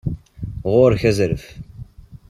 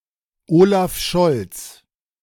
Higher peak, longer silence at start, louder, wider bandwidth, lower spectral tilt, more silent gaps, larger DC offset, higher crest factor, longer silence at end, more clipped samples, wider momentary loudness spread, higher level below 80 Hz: about the same, -2 dBFS vs -2 dBFS; second, 0.05 s vs 0.5 s; about the same, -18 LUFS vs -17 LUFS; second, 14 kHz vs 17.5 kHz; first, -7 dB/octave vs -5.5 dB/octave; neither; neither; about the same, 18 dB vs 16 dB; second, 0.15 s vs 0.5 s; neither; first, 23 LU vs 19 LU; first, -38 dBFS vs -44 dBFS